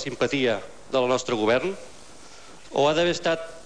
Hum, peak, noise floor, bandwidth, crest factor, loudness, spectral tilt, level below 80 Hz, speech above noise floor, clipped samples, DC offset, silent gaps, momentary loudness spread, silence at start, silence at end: none; -10 dBFS; -47 dBFS; 10.5 kHz; 16 dB; -24 LUFS; -4 dB/octave; -58 dBFS; 23 dB; under 0.1%; 0.6%; none; 10 LU; 0 s; 0.05 s